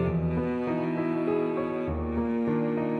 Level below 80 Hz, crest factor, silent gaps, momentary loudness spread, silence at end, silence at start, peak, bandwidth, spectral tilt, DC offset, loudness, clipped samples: -44 dBFS; 12 dB; none; 3 LU; 0 s; 0 s; -14 dBFS; 4.7 kHz; -10 dB/octave; under 0.1%; -28 LUFS; under 0.1%